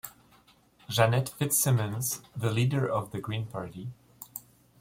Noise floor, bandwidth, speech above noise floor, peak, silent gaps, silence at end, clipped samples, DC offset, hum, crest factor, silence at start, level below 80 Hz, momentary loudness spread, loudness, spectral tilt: -61 dBFS; 16.5 kHz; 33 dB; -8 dBFS; none; 0.4 s; under 0.1%; under 0.1%; none; 22 dB; 0.05 s; -62 dBFS; 18 LU; -28 LUFS; -4.5 dB/octave